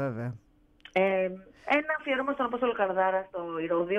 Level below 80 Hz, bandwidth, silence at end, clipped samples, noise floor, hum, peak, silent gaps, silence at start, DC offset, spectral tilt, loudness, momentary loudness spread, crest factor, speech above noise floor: -66 dBFS; 6.8 kHz; 0 s; under 0.1%; -56 dBFS; none; -12 dBFS; none; 0 s; under 0.1%; -7.5 dB/octave; -29 LUFS; 10 LU; 18 dB; 27 dB